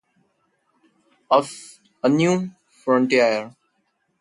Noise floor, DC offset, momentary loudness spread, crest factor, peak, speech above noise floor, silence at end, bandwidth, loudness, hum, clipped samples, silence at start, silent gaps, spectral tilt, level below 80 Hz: -70 dBFS; under 0.1%; 17 LU; 20 dB; -4 dBFS; 51 dB; 0.7 s; 11.5 kHz; -20 LUFS; none; under 0.1%; 1.3 s; none; -5.5 dB/octave; -70 dBFS